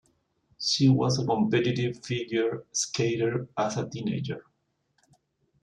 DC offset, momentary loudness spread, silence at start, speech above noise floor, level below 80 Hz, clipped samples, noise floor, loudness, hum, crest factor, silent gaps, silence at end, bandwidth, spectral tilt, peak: under 0.1%; 9 LU; 0.6 s; 48 dB; -64 dBFS; under 0.1%; -75 dBFS; -27 LUFS; none; 18 dB; none; 1.2 s; 11 kHz; -5 dB/octave; -12 dBFS